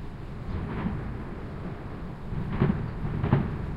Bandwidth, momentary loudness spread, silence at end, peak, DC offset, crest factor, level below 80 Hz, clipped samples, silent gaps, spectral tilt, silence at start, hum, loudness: 5.6 kHz; 12 LU; 0 s; -10 dBFS; under 0.1%; 22 dB; -40 dBFS; under 0.1%; none; -9.5 dB/octave; 0 s; none; -32 LUFS